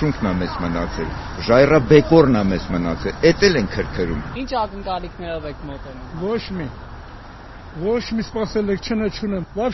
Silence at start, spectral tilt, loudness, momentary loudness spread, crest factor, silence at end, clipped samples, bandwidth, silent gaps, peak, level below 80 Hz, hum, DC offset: 0 s; -5.5 dB/octave; -19 LUFS; 20 LU; 20 dB; 0 s; under 0.1%; 6.2 kHz; none; 0 dBFS; -34 dBFS; none; under 0.1%